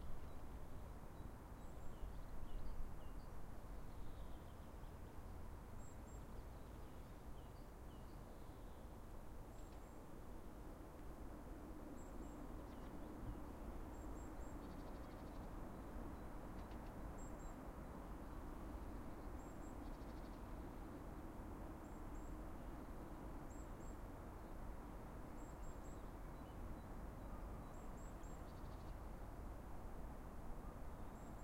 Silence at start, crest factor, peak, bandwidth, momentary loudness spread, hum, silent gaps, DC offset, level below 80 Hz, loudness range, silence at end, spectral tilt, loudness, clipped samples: 0 s; 16 dB; -36 dBFS; 16 kHz; 4 LU; none; none; under 0.1%; -54 dBFS; 3 LU; 0 s; -6.5 dB/octave; -56 LUFS; under 0.1%